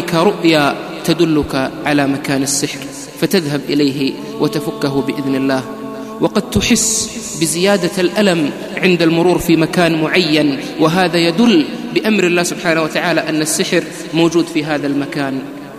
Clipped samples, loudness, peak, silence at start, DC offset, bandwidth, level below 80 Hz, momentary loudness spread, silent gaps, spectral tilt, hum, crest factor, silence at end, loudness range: under 0.1%; -15 LUFS; 0 dBFS; 0 s; under 0.1%; 15.5 kHz; -44 dBFS; 8 LU; none; -4 dB/octave; none; 14 dB; 0 s; 4 LU